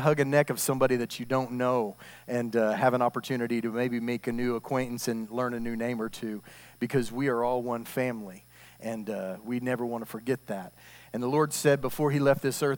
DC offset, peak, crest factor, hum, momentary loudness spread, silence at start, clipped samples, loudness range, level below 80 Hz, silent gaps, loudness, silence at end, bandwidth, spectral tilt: under 0.1%; -10 dBFS; 20 dB; none; 12 LU; 0 s; under 0.1%; 5 LU; -60 dBFS; none; -29 LUFS; 0 s; 18 kHz; -5.5 dB/octave